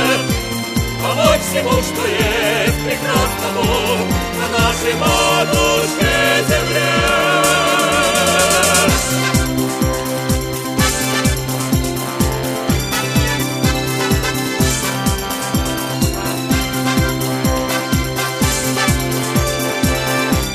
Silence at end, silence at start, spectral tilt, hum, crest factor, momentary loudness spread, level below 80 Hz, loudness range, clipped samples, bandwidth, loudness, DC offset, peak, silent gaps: 0 s; 0 s; -3.5 dB/octave; none; 16 dB; 6 LU; -28 dBFS; 4 LU; under 0.1%; 15.5 kHz; -16 LUFS; under 0.1%; 0 dBFS; none